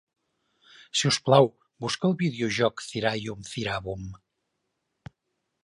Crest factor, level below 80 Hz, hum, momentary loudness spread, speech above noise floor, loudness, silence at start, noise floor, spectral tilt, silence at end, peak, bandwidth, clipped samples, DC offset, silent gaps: 24 dB; -58 dBFS; none; 15 LU; 54 dB; -26 LUFS; 0.95 s; -80 dBFS; -4.5 dB/octave; 1.45 s; -4 dBFS; 11.5 kHz; under 0.1%; under 0.1%; none